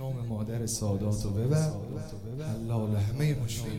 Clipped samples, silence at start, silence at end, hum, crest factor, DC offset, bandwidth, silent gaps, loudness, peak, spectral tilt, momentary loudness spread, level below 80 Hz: under 0.1%; 0 s; 0 s; none; 14 dB; 0.2%; 16.5 kHz; none; -31 LUFS; -16 dBFS; -6 dB/octave; 10 LU; -48 dBFS